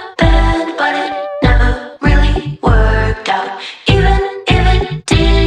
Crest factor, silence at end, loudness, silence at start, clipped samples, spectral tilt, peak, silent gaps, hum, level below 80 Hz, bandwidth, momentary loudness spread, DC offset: 12 dB; 0 s; -14 LUFS; 0 s; under 0.1%; -6 dB/octave; 0 dBFS; none; none; -14 dBFS; 9.6 kHz; 5 LU; under 0.1%